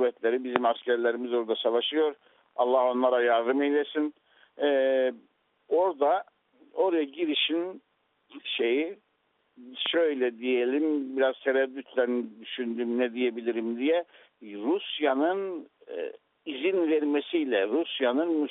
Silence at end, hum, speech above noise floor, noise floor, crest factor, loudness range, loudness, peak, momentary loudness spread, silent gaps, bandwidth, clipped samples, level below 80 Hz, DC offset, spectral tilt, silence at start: 0 s; none; 45 dB; -72 dBFS; 24 dB; 4 LU; -27 LUFS; -4 dBFS; 12 LU; none; 4 kHz; under 0.1%; -80 dBFS; under 0.1%; -0.5 dB/octave; 0 s